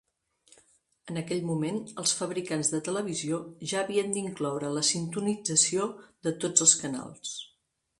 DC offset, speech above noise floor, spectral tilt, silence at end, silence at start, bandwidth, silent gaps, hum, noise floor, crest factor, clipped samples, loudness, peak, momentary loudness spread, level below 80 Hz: under 0.1%; 44 dB; -3 dB/octave; 0.55 s; 1.05 s; 11.5 kHz; none; none; -73 dBFS; 24 dB; under 0.1%; -28 LUFS; -6 dBFS; 14 LU; -72 dBFS